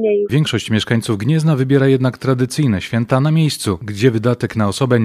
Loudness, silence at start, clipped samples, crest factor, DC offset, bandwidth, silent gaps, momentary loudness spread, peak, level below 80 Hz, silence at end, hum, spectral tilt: -16 LUFS; 0 s; under 0.1%; 16 dB; under 0.1%; 14.5 kHz; none; 4 LU; 0 dBFS; -50 dBFS; 0 s; none; -6.5 dB/octave